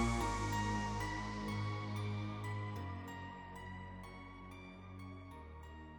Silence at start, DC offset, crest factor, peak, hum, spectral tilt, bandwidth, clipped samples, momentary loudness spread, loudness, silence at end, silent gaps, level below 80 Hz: 0 s; under 0.1%; 18 dB; -24 dBFS; none; -5.5 dB/octave; 18.5 kHz; under 0.1%; 15 LU; -43 LUFS; 0 s; none; -52 dBFS